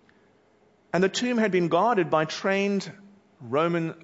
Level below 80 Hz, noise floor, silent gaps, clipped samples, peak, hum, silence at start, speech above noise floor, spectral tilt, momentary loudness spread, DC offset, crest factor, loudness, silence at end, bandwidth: -72 dBFS; -62 dBFS; none; under 0.1%; -8 dBFS; none; 0.95 s; 37 dB; -5.5 dB/octave; 8 LU; under 0.1%; 18 dB; -25 LUFS; 0.1 s; 8 kHz